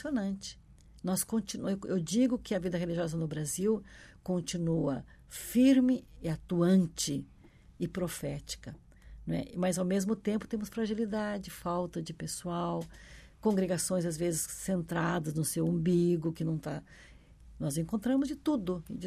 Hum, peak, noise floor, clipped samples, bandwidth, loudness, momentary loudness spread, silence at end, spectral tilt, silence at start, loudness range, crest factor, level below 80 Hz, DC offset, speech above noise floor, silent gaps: none; -16 dBFS; -55 dBFS; under 0.1%; 14.5 kHz; -32 LUFS; 12 LU; 0 s; -5.5 dB/octave; 0 s; 5 LU; 18 dB; -56 dBFS; under 0.1%; 23 dB; none